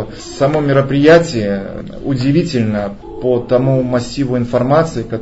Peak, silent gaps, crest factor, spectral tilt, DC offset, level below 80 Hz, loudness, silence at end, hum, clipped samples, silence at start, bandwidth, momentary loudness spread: 0 dBFS; none; 14 dB; -7 dB/octave; 0.4%; -38 dBFS; -14 LUFS; 0 s; none; under 0.1%; 0 s; 8 kHz; 12 LU